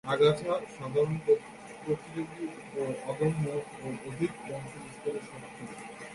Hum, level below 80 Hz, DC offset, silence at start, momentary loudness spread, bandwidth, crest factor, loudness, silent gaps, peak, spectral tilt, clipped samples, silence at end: none; -64 dBFS; under 0.1%; 0.05 s; 16 LU; 11.5 kHz; 20 dB; -32 LUFS; none; -12 dBFS; -6.5 dB/octave; under 0.1%; 0 s